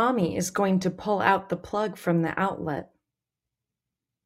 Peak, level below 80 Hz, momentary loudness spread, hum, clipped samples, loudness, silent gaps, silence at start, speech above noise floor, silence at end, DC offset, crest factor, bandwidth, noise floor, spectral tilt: -6 dBFS; -62 dBFS; 8 LU; none; under 0.1%; -26 LUFS; none; 0 s; 62 dB; 1.4 s; under 0.1%; 22 dB; 15.5 kHz; -88 dBFS; -5.5 dB/octave